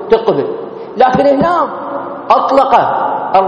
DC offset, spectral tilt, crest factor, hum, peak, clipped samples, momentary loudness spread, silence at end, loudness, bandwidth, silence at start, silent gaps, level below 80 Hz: under 0.1%; -7 dB/octave; 12 dB; none; 0 dBFS; 0.2%; 12 LU; 0 s; -12 LUFS; 9.4 kHz; 0 s; none; -46 dBFS